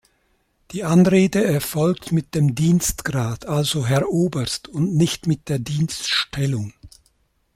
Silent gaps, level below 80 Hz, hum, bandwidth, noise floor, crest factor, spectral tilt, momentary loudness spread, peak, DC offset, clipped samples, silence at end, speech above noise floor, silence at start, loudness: none; -46 dBFS; none; 16 kHz; -65 dBFS; 16 dB; -5.5 dB/octave; 8 LU; -4 dBFS; under 0.1%; under 0.1%; 0.65 s; 46 dB; 0.7 s; -20 LUFS